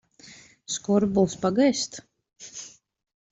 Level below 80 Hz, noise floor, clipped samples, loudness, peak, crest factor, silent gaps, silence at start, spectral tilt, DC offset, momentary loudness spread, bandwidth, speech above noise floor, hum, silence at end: -60 dBFS; -51 dBFS; under 0.1%; -24 LUFS; -8 dBFS; 18 dB; none; 0.25 s; -5 dB/octave; under 0.1%; 22 LU; 8.2 kHz; 27 dB; none; 0.65 s